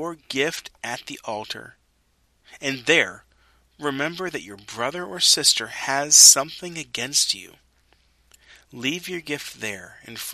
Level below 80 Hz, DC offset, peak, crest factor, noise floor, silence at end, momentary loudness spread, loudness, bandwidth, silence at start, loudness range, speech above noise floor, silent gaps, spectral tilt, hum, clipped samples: -64 dBFS; under 0.1%; 0 dBFS; 24 dB; -65 dBFS; 0 s; 18 LU; -19 LUFS; 13.5 kHz; 0 s; 11 LU; 42 dB; none; 0 dB/octave; none; under 0.1%